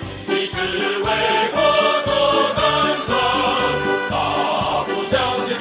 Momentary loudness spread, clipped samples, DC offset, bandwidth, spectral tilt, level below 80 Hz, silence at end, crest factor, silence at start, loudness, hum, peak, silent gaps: 5 LU; under 0.1%; under 0.1%; 4 kHz; -8.5 dB/octave; -44 dBFS; 0 s; 14 dB; 0 s; -18 LUFS; none; -4 dBFS; none